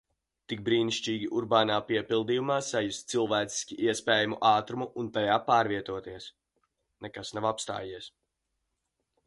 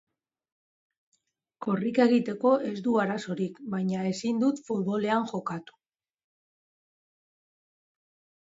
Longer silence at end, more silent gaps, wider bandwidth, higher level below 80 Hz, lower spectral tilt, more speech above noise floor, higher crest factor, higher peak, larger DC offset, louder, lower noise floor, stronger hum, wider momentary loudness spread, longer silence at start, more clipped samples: second, 1.2 s vs 2.85 s; neither; first, 11.5 kHz vs 7.8 kHz; first, -66 dBFS vs -74 dBFS; second, -4 dB/octave vs -6.5 dB/octave; first, 53 dB vs 37 dB; about the same, 20 dB vs 22 dB; about the same, -10 dBFS vs -8 dBFS; neither; about the same, -29 LUFS vs -28 LUFS; first, -82 dBFS vs -63 dBFS; neither; first, 16 LU vs 9 LU; second, 0.5 s vs 1.6 s; neither